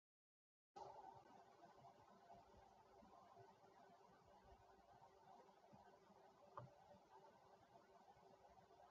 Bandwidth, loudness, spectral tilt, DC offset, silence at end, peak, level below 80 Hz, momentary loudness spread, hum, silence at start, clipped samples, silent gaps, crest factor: 7.2 kHz; -66 LUFS; -4.5 dB/octave; under 0.1%; 0 s; -42 dBFS; -88 dBFS; 8 LU; none; 0.75 s; under 0.1%; none; 26 dB